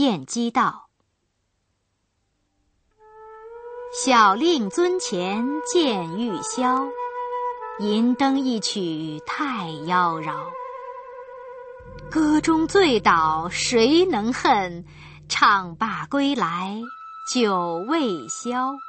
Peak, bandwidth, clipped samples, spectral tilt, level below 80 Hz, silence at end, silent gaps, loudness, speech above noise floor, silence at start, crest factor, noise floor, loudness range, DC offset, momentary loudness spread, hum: -2 dBFS; 8.8 kHz; under 0.1%; -4 dB/octave; -54 dBFS; 0 s; none; -22 LUFS; 51 dB; 0 s; 20 dB; -72 dBFS; 7 LU; under 0.1%; 19 LU; none